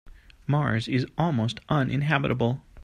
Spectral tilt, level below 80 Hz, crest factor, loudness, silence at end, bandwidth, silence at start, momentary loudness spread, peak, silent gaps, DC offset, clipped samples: -7.5 dB/octave; -50 dBFS; 20 dB; -26 LUFS; 0 s; 9.8 kHz; 0.05 s; 4 LU; -6 dBFS; none; under 0.1%; under 0.1%